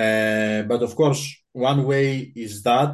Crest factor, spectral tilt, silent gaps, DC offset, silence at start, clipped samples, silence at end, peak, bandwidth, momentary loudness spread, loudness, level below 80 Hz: 14 dB; -5.5 dB/octave; none; under 0.1%; 0 s; under 0.1%; 0 s; -6 dBFS; 12.5 kHz; 8 LU; -21 LUFS; -60 dBFS